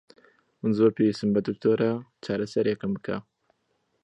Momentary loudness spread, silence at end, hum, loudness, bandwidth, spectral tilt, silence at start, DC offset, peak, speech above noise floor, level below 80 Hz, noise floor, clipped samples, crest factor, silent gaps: 10 LU; 0.8 s; none; -26 LUFS; 8.8 kHz; -7.5 dB/octave; 0.65 s; under 0.1%; -8 dBFS; 48 dB; -64 dBFS; -73 dBFS; under 0.1%; 18 dB; none